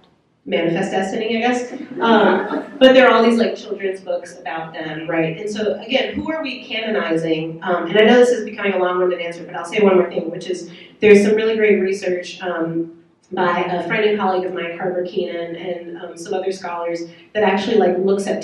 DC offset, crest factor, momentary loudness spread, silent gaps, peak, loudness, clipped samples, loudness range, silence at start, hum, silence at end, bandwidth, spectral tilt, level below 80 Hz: under 0.1%; 18 dB; 15 LU; none; 0 dBFS; -18 LUFS; under 0.1%; 7 LU; 0.45 s; none; 0 s; 11.5 kHz; -5.5 dB/octave; -60 dBFS